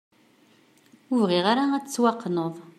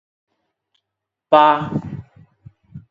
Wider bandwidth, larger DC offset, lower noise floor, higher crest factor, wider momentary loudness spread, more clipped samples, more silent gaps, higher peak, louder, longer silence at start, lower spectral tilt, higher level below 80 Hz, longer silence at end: first, 14 kHz vs 7.4 kHz; neither; second, -59 dBFS vs -82 dBFS; about the same, 18 dB vs 20 dB; second, 7 LU vs 21 LU; neither; neither; second, -8 dBFS vs 0 dBFS; second, -24 LUFS vs -16 LUFS; second, 1.1 s vs 1.3 s; second, -5 dB/octave vs -7.5 dB/octave; second, -76 dBFS vs -56 dBFS; about the same, 0.1 s vs 0.1 s